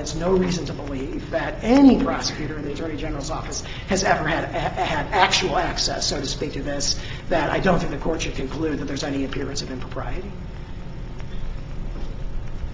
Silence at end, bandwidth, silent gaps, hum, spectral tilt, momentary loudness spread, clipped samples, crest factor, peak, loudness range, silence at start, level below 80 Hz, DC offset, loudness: 0 s; 7.8 kHz; none; none; -4.5 dB/octave; 17 LU; under 0.1%; 22 dB; 0 dBFS; 9 LU; 0 s; -34 dBFS; under 0.1%; -23 LUFS